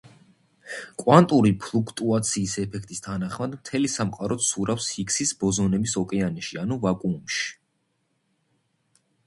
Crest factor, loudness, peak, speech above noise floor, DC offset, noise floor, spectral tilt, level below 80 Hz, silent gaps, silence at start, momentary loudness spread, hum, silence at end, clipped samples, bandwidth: 24 dB; -24 LUFS; -2 dBFS; 49 dB; under 0.1%; -73 dBFS; -4.5 dB/octave; -54 dBFS; none; 0.65 s; 13 LU; none; 1.75 s; under 0.1%; 11.5 kHz